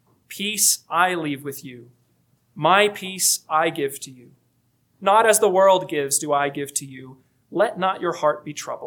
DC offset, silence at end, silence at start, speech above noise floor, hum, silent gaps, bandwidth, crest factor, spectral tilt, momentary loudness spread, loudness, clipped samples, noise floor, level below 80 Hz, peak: under 0.1%; 0 s; 0.3 s; 44 dB; none; none; 19 kHz; 20 dB; -2 dB/octave; 18 LU; -20 LUFS; under 0.1%; -66 dBFS; -76 dBFS; -2 dBFS